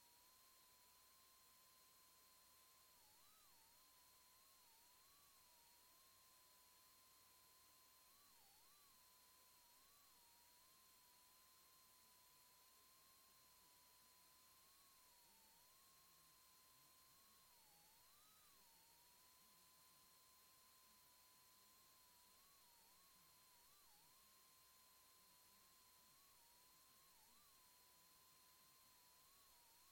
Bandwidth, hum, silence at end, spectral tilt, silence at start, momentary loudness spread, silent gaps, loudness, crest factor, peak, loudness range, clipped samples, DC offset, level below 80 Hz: 16.5 kHz; none; 0 s; -0.5 dB/octave; 0 s; 0 LU; none; -70 LUFS; 14 dB; -58 dBFS; 0 LU; under 0.1%; under 0.1%; under -90 dBFS